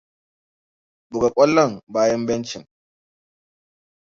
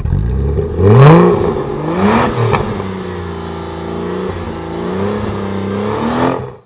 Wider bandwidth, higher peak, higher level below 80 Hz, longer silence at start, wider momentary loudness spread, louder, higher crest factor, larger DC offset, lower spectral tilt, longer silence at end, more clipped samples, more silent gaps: first, 7.6 kHz vs 4 kHz; second, -4 dBFS vs 0 dBFS; second, -58 dBFS vs -26 dBFS; first, 1.1 s vs 0 s; about the same, 16 LU vs 16 LU; second, -19 LUFS vs -14 LUFS; first, 20 dB vs 12 dB; neither; second, -5 dB/octave vs -12 dB/octave; first, 1.55 s vs 0.1 s; second, under 0.1% vs 0.3%; first, 1.83-1.87 s vs none